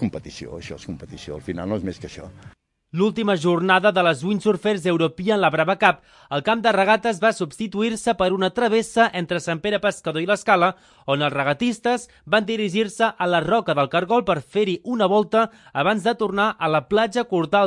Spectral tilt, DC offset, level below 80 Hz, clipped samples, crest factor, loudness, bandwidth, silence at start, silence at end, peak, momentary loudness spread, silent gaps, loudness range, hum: -5 dB/octave; under 0.1%; -56 dBFS; under 0.1%; 20 dB; -21 LUFS; 11.5 kHz; 0 s; 0 s; 0 dBFS; 13 LU; none; 2 LU; none